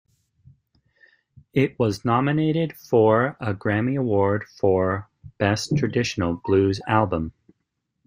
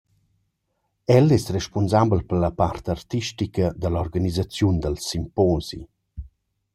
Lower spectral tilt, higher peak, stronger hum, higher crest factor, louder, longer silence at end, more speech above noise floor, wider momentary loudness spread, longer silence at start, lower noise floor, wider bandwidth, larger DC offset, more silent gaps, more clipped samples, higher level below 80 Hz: about the same, -6.5 dB/octave vs -6.5 dB/octave; about the same, -4 dBFS vs -2 dBFS; neither; about the same, 20 dB vs 20 dB; about the same, -22 LUFS vs -22 LUFS; first, 0.75 s vs 0.5 s; about the same, 56 dB vs 53 dB; second, 6 LU vs 16 LU; first, 1.55 s vs 1.1 s; about the same, -77 dBFS vs -74 dBFS; about the same, 15.5 kHz vs 15.5 kHz; neither; neither; neither; second, -54 dBFS vs -42 dBFS